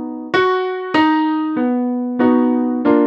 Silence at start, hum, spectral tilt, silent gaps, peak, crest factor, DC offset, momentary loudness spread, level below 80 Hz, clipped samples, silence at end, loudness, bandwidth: 0 s; none; -6.5 dB/octave; none; -2 dBFS; 14 dB; under 0.1%; 5 LU; -60 dBFS; under 0.1%; 0 s; -17 LUFS; 6.4 kHz